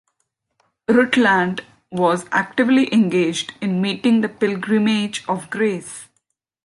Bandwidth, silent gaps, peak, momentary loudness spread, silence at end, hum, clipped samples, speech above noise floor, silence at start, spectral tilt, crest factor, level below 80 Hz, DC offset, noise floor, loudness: 11.5 kHz; none; -2 dBFS; 12 LU; 0.6 s; none; under 0.1%; 55 dB; 0.9 s; -5 dB/octave; 16 dB; -64 dBFS; under 0.1%; -73 dBFS; -18 LUFS